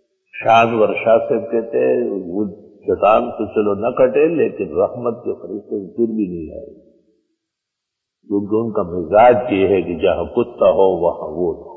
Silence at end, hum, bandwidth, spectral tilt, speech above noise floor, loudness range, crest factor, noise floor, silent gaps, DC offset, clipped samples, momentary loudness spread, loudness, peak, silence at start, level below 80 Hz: 0 s; none; 6.8 kHz; -8 dB/octave; 64 dB; 9 LU; 16 dB; -80 dBFS; none; under 0.1%; under 0.1%; 13 LU; -17 LUFS; -2 dBFS; 0.35 s; -48 dBFS